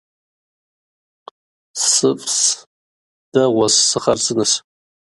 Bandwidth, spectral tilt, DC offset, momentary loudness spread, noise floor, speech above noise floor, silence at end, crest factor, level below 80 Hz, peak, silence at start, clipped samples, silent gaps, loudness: 11.5 kHz; -2 dB/octave; under 0.1%; 8 LU; under -90 dBFS; over 74 dB; 0.45 s; 18 dB; -60 dBFS; -2 dBFS; 1.75 s; under 0.1%; 2.66-3.32 s; -15 LUFS